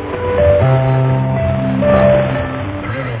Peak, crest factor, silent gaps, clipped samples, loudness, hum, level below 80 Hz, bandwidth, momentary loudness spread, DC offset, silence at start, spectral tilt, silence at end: 0 dBFS; 14 dB; none; under 0.1%; -14 LUFS; none; -28 dBFS; 4 kHz; 10 LU; under 0.1%; 0 s; -12 dB/octave; 0 s